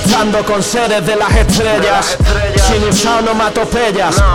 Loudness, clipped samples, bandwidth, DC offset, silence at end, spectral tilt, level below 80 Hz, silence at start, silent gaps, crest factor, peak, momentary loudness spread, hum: -12 LUFS; under 0.1%; 17 kHz; under 0.1%; 0 s; -4 dB/octave; -18 dBFS; 0 s; none; 12 dB; 0 dBFS; 3 LU; none